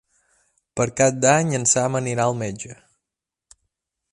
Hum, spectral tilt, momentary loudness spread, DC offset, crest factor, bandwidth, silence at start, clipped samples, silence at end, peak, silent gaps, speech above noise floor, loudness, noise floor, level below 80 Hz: none; -4 dB/octave; 16 LU; under 0.1%; 20 dB; 11.5 kHz; 0.75 s; under 0.1%; 1.4 s; -2 dBFS; none; 66 dB; -20 LUFS; -86 dBFS; -58 dBFS